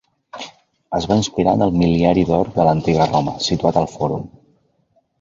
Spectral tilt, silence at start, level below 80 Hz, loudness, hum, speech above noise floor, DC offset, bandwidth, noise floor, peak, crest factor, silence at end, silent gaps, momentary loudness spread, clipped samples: -6.5 dB/octave; 0.35 s; -40 dBFS; -17 LUFS; none; 46 dB; under 0.1%; 7.8 kHz; -63 dBFS; -2 dBFS; 16 dB; 0.9 s; none; 18 LU; under 0.1%